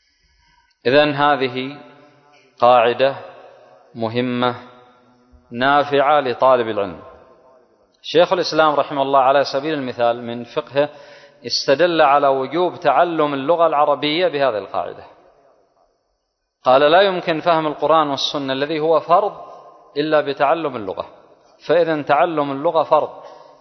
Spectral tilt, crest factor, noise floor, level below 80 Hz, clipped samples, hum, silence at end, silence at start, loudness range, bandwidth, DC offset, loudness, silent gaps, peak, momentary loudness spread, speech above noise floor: -5 dB/octave; 18 dB; -72 dBFS; -62 dBFS; under 0.1%; none; 0.25 s; 0.85 s; 3 LU; 6.4 kHz; under 0.1%; -17 LUFS; none; 0 dBFS; 13 LU; 55 dB